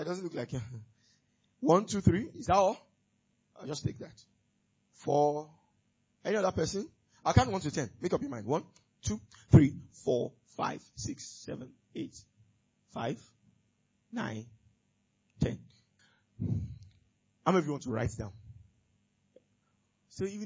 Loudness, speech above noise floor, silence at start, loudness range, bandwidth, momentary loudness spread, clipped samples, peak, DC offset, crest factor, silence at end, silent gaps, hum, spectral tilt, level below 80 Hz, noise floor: -32 LUFS; 44 dB; 0 s; 12 LU; 8 kHz; 18 LU; under 0.1%; -8 dBFS; under 0.1%; 24 dB; 0 s; none; none; -6.5 dB/octave; -50 dBFS; -75 dBFS